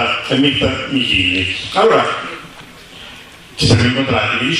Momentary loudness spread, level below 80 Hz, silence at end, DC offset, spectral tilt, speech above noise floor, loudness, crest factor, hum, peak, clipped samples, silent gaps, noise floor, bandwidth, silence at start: 21 LU; -38 dBFS; 0 s; under 0.1%; -5 dB/octave; 23 dB; -14 LUFS; 16 dB; none; 0 dBFS; under 0.1%; none; -37 dBFS; 13 kHz; 0 s